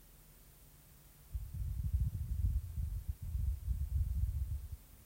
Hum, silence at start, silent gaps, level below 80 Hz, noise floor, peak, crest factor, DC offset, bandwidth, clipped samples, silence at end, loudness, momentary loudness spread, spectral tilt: none; 0 s; none; -40 dBFS; -60 dBFS; -24 dBFS; 16 dB; under 0.1%; 16 kHz; under 0.1%; 0 s; -41 LUFS; 22 LU; -7 dB/octave